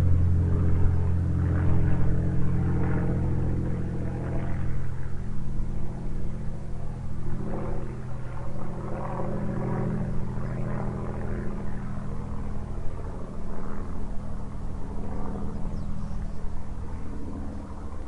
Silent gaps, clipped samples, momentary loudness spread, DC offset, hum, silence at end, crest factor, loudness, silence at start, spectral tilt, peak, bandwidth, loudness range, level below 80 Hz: none; under 0.1%; 12 LU; under 0.1%; none; 0 s; 16 dB; -31 LUFS; 0 s; -9.5 dB/octave; -8 dBFS; 3.4 kHz; 10 LU; -34 dBFS